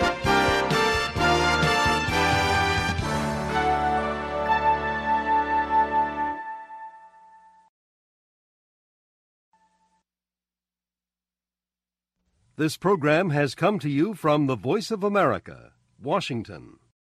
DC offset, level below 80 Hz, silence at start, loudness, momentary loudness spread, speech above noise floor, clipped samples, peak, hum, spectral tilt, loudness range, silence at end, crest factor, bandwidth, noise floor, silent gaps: under 0.1%; -44 dBFS; 0 s; -23 LUFS; 11 LU; over 66 dB; under 0.1%; -8 dBFS; 60 Hz at -65 dBFS; -5 dB/octave; 9 LU; 0.5 s; 18 dB; 15 kHz; under -90 dBFS; 7.69-9.52 s